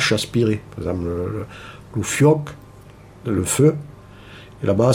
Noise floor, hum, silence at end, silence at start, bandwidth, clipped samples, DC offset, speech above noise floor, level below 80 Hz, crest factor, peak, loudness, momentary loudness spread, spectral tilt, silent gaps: -43 dBFS; none; 0 s; 0 s; 17 kHz; under 0.1%; under 0.1%; 24 dB; -46 dBFS; 16 dB; -4 dBFS; -20 LUFS; 23 LU; -5.5 dB/octave; none